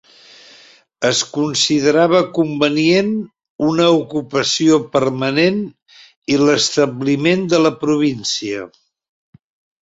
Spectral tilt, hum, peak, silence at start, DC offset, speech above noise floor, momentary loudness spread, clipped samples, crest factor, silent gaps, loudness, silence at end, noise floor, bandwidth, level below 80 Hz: -4 dB/octave; none; -2 dBFS; 1 s; under 0.1%; 32 dB; 9 LU; under 0.1%; 16 dB; 3.50-3.59 s, 6.16-6.22 s; -16 LUFS; 1.15 s; -47 dBFS; 8 kHz; -58 dBFS